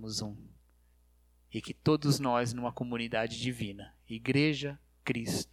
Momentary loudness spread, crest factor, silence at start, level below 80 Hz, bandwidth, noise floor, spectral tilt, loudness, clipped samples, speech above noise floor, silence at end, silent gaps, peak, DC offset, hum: 15 LU; 20 dB; 0 s; -60 dBFS; 15.5 kHz; -66 dBFS; -5 dB/octave; -33 LUFS; under 0.1%; 33 dB; 0.1 s; none; -14 dBFS; under 0.1%; 60 Hz at -55 dBFS